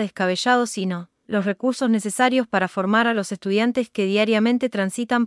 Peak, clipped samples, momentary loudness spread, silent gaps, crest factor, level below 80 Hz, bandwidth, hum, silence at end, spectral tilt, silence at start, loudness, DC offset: -4 dBFS; under 0.1%; 6 LU; none; 16 dB; -70 dBFS; 12 kHz; none; 0 s; -4.5 dB/octave; 0 s; -21 LUFS; under 0.1%